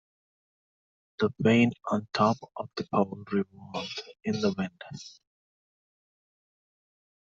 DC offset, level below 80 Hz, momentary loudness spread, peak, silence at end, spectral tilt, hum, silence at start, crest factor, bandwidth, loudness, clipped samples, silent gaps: under 0.1%; -68 dBFS; 15 LU; -10 dBFS; 2.1 s; -6.5 dB/octave; none; 1.2 s; 22 dB; 7.6 kHz; -29 LUFS; under 0.1%; none